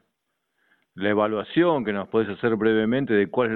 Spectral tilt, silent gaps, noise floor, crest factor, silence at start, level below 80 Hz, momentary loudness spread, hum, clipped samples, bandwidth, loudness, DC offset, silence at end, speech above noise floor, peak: -9.5 dB/octave; none; -77 dBFS; 16 dB; 0.95 s; -60 dBFS; 4 LU; none; under 0.1%; 4.3 kHz; -23 LUFS; under 0.1%; 0 s; 55 dB; -8 dBFS